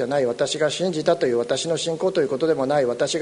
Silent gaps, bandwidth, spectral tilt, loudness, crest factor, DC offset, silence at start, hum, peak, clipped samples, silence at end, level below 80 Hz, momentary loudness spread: none; 11 kHz; -4 dB/octave; -22 LUFS; 16 dB; under 0.1%; 0 s; none; -6 dBFS; under 0.1%; 0 s; -62 dBFS; 2 LU